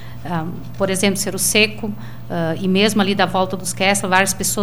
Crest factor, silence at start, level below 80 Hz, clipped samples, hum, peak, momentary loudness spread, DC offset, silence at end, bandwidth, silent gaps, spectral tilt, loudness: 18 dB; 0 s; -44 dBFS; under 0.1%; none; 0 dBFS; 12 LU; 3%; 0 s; 17.5 kHz; none; -3.5 dB/octave; -18 LUFS